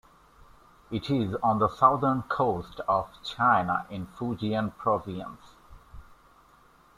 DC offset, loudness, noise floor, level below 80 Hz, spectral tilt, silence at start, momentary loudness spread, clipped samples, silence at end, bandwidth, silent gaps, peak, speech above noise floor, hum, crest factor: under 0.1%; -27 LUFS; -58 dBFS; -56 dBFS; -7.5 dB/octave; 0.9 s; 15 LU; under 0.1%; 0.85 s; 14.5 kHz; none; -6 dBFS; 31 dB; none; 22 dB